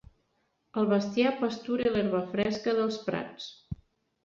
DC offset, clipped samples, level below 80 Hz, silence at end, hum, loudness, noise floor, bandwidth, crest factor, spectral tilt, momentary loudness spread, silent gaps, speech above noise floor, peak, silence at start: under 0.1%; under 0.1%; -58 dBFS; 0.5 s; none; -29 LUFS; -75 dBFS; 7.4 kHz; 16 dB; -6.5 dB/octave; 15 LU; none; 46 dB; -14 dBFS; 0.75 s